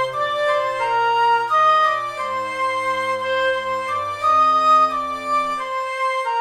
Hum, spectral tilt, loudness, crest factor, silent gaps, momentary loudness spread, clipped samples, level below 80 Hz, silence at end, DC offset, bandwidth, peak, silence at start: none; -2.5 dB/octave; -19 LUFS; 12 dB; none; 9 LU; under 0.1%; -62 dBFS; 0 s; under 0.1%; 13 kHz; -8 dBFS; 0 s